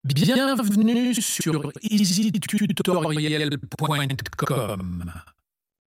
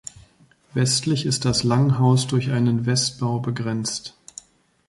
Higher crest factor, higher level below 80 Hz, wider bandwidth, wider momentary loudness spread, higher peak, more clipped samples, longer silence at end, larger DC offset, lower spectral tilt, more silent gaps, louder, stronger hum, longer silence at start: about the same, 14 dB vs 16 dB; about the same, -54 dBFS vs -52 dBFS; first, 16.5 kHz vs 11.5 kHz; second, 8 LU vs 19 LU; second, -10 dBFS vs -6 dBFS; neither; second, 0.65 s vs 0.8 s; neither; about the same, -5 dB/octave vs -5 dB/octave; neither; about the same, -23 LUFS vs -21 LUFS; neither; second, 0.05 s vs 0.75 s